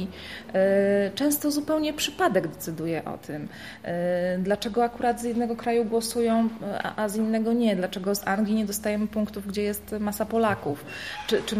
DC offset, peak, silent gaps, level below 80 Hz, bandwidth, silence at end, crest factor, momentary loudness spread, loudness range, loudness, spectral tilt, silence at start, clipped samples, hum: 0.1%; -10 dBFS; none; -56 dBFS; 15.5 kHz; 0 s; 16 dB; 9 LU; 2 LU; -26 LUFS; -5 dB/octave; 0 s; under 0.1%; none